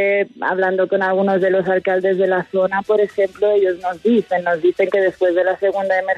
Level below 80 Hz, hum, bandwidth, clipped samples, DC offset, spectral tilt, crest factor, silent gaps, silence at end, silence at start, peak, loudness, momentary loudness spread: -62 dBFS; none; 7.4 kHz; under 0.1%; under 0.1%; -7 dB/octave; 12 dB; none; 0 s; 0 s; -6 dBFS; -17 LUFS; 3 LU